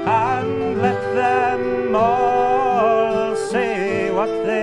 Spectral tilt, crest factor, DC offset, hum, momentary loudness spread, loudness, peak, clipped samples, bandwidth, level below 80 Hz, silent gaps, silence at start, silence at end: -6 dB/octave; 14 dB; under 0.1%; none; 4 LU; -19 LUFS; -4 dBFS; under 0.1%; 11.5 kHz; -52 dBFS; none; 0 s; 0 s